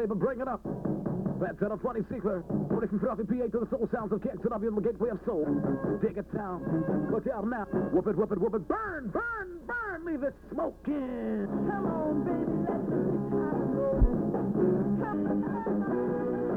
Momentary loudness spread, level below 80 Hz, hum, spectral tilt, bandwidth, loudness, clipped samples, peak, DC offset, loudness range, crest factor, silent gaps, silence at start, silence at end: 6 LU; -42 dBFS; none; -10.5 dB/octave; 4 kHz; -31 LUFS; under 0.1%; -14 dBFS; under 0.1%; 3 LU; 16 dB; none; 0 s; 0 s